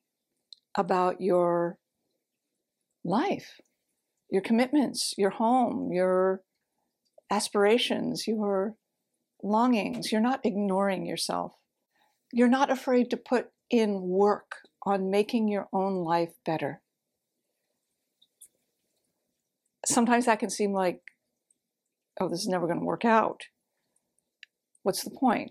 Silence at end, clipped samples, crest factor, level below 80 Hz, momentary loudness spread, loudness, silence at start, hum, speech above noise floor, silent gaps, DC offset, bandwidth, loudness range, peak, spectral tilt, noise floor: 0 s; under 0.1%; 20 dB; -78 dBFS; 10 LU; -27 LUFS; 0.75 s; none; 58 dB; none; under 0.1%; 15 kHz; 5 LU; -8 dBFS; -4.5 dB/octave; -85 dBFS